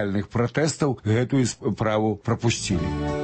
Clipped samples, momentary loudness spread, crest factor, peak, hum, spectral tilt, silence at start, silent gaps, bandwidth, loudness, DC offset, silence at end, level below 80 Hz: under 0.1%; 3 LU; 14 dB; -8 dBFS; none; -5.5 dB/octave; 0 s; none; 8.8 kHz; -24 LUFS; under 0.1%; 0 s; -42 dBFS